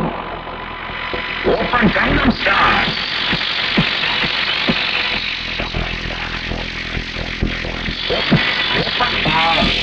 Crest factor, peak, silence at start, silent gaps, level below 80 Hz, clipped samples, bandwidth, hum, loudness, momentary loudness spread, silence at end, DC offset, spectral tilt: 16 dB; -2 dBFS; 0 s; none; -32 dBFS; under 0.1%; 8.8 kHz; none; -17 LUFS; 9 LU; 0 s; under 0.1%; -5 dB/octave